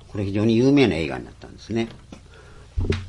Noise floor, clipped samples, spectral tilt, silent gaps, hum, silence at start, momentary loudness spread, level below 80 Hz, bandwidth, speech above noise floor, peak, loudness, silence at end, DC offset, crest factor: -45 dBFS; under 0.1%; -7 dB/octave; none; none; 0.1 s; 17 LU; -38 dBFS; 10.5 kHz; 23 dB; -4 dBFS; -22 LUFS; 0 s; under 0.1%; 18 dB